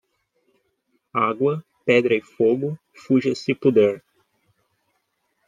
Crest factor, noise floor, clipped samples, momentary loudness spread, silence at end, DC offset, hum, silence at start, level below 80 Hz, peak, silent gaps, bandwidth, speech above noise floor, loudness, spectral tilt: 20 dB; -72 dBFS; under 0.1%; 11 LU; 1.5 s; under 0.1%; none; 1.15 s; -70 dBFS; -2 dBFS; none; 9.2 kHz; 52 dB; -21 LUFS; -7 dB/octave